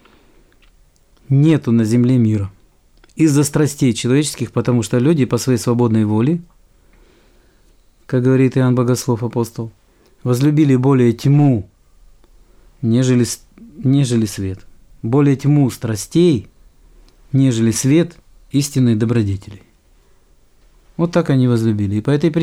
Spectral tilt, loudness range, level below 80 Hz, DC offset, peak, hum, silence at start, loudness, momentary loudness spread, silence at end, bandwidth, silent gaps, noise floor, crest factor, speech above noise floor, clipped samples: -7 dB/octave; 3 LU; -48 dBFS; under 0.1%; -2 dBFS; none; 1.3 s; -16 LUFS; 10 LU; 0 s; 15.5 kHz; none; -52 dBFS; 14 dB; 37 dB; under 0.1%